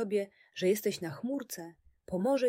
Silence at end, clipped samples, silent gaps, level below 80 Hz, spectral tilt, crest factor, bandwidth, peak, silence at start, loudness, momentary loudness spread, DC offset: 0 s; under 0.1%; none; -70 dBFS; -5 dB/octave; 16 dB; 16 kHz; -18 dBFS; 0 s; -34 LUFS; 13 LU; under 0.1%